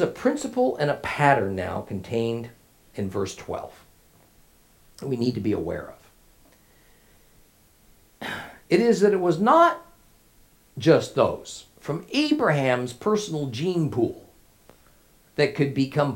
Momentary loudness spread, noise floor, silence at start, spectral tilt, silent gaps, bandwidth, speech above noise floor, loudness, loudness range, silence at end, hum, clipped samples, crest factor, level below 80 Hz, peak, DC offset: 16 LU; -57 dBFS; 0 s; -6 dB/octave; none; 17 kHz; 34 dB; -24 LUFS; 10 LU; 0 s; none; under 0.1%; 22 dB; -60 dBFS; -2 dBFS; under 0.1%